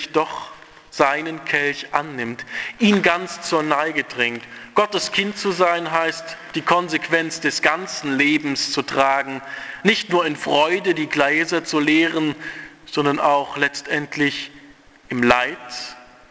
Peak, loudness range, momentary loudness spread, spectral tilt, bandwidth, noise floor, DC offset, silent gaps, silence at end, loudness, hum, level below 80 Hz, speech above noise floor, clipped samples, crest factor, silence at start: 0 dBFS; 2 LU; 12 LU; -4 dB/octave; 8 kHz; -47 dBFS; under 0.1%; none; 0.25 s; -20 LUFS; none; -60 dBFS; 27 dB; under 0.1%; 20 dB; 0 s